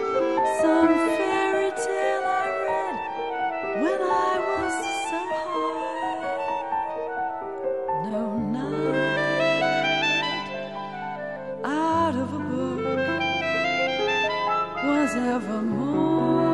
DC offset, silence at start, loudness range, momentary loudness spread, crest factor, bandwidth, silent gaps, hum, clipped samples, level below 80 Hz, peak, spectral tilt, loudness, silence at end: 0.2%; 0 s; 4 LU; 8 LU; 16 dB; 11.5 kHz; none; none; under 0.1%; -60 dBFS; -8 dBFS; -5 dB/octave; -25 LUFS; 0 s